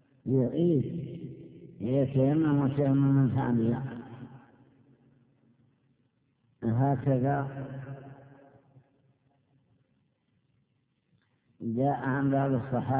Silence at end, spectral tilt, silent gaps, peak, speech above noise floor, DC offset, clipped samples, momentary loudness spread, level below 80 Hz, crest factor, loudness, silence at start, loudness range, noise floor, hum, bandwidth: 0 s; -9.5 dB/octave; none; -16 dBFS; 47 dB; under 0.1%; under 0.1%; 19 LU; -62 dBFS; 16 dB; -28 LUFS; 0.25 s; 12 LU; -74 dBFS; none; 3.7 kHz